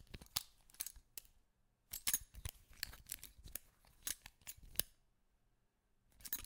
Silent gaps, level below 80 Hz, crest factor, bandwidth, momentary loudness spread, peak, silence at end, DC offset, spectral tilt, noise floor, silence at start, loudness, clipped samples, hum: none; -64 dBFS; 38 dB; 18 kHz; 16 LU; -12 dBFS; 0 s; under 0.1%; 0 dB/octave; -79 dBFS; 0 s; -45 LUFS; under 0.1%; none